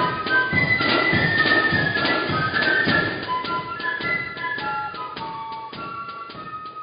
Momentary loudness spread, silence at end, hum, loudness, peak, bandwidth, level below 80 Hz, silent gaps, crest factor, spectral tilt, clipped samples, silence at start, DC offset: 15 LU; 0 s; none; -21 LUFS; -6 dBFS; 5.2 kHz; -48 dBFS; none; 16 dB; -9.5 dB/octave; under 0.1%; 0 s; under 0.1%